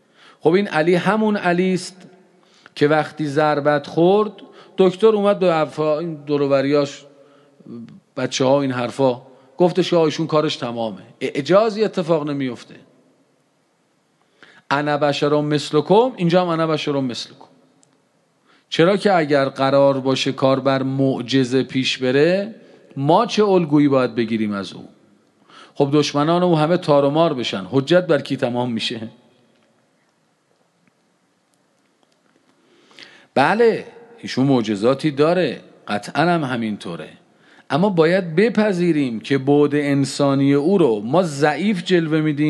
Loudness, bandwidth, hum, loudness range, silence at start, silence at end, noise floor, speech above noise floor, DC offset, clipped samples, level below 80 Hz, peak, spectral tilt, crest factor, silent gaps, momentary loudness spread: -18 LUFS; 11.5 kHz; none; 5 LU; 0.45 s; 0 s; -63 dBFS; 45 dB; under 0.1%; under 0.1%; -70 dBFS; -2 dBFS; -6 dB/octave; 18 dB; none; 11 LU